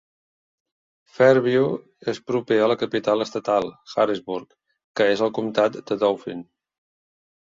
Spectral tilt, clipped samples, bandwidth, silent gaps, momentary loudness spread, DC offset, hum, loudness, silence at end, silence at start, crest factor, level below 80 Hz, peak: -6 dB/octave; under 0.1%; 7.6 kHz; 4.84-4.94 s; 12 LU; under 0.1%; none; -22 LUFS; 1 s; 1.2 s; 20 dB; -66 dBFS; -2 dBFS